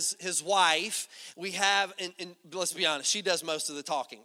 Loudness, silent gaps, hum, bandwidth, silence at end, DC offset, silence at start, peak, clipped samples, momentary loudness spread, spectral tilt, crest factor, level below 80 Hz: -28 LUFS; none; none; 17 kHz; 0.05 s; under 0.1%; 0 s; -10 dBFS; under 0.1%; 14 LU; -0.5 dB/octave; 20 dB; -86 dBFS